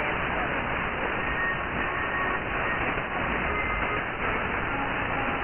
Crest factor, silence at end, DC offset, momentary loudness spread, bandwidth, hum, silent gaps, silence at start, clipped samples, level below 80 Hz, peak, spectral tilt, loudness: 14 dB; 0 s; under 0.1%; 1 LU; 3.4 kHz; none; none; 0 s; under 0.1%; -40 dBFS; -14 dBFS; -0.5 dB/octave; -27 LUFS